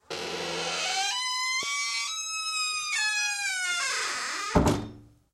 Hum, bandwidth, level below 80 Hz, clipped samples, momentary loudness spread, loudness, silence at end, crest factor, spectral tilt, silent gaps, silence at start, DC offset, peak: none; 16 kHz; -46 dBFS; under 0.1%; 6 LU; -27 LUFS; 0.25 s; 22 dB; -2 dB/octave; none; 0.1 s; under 0.1%; -8 dBFS